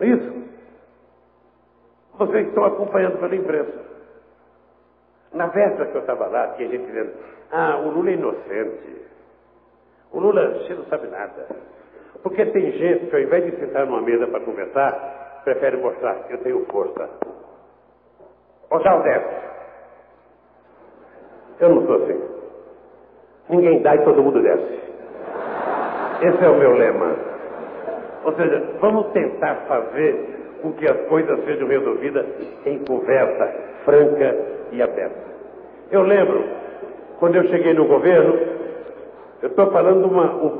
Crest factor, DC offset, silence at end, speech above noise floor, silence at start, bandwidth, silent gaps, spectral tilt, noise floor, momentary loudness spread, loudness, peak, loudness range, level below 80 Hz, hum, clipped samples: 16 dB; under 0.1%; 0 s; 39 dB; 0 s; 4 kHz; none; -11 dB/octave; -57 dBFS; 18 LU; -19 LUFS; -4 dBFS; 7 LU; -64 dBFS; 60 Hz at -60 dBFS; under 0.1%